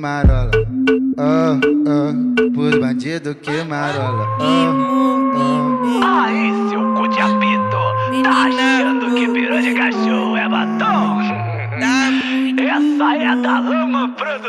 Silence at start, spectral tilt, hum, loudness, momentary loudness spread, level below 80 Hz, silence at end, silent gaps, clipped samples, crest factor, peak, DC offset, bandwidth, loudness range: 0 s; -6 dB/octave; none; -16 LUFS; 5 LU; -32 dBFS; 0 s; none; under 0.1%; 12 dB; -4 dBFS; under 0.1%; 11.5 kHz; 2 LU